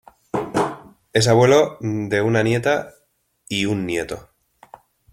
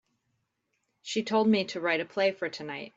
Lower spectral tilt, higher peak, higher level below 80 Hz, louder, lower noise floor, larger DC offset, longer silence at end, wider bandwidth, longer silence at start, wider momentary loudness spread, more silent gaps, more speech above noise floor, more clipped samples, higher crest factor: about the same, -5 dB/octave vs -4.5 dB/octave; first, -2 dBFS vs -14 dBFS; first, -54 dBFS vs -76 dBFS; first, -20 LUFS vs -28 LUFS; second, -54 dBFS vs -79 dBFS; neither; first, 0.95 s vs 0.1 s; first, 15.5 kHz vs 8 kHz; second, 0.35 s vs 1.05 s; first, 15 LU vs 11 LU; neither; second, 36 dB vs 50 dB; neither; about the same, 18 dB vs 18 dB